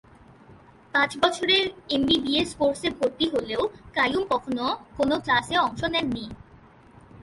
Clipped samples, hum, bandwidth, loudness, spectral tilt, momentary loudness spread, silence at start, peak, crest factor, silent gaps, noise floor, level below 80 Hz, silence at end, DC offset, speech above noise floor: under 0.1%; none; 11.5 kHz; -24 LUFS; -4 dB/octave; 7 LU; 0.5 s; -6 dBFS; 20 dB; none; -52 dBFS; -52 dBFS; 0 s; under 0.1%; 27 dB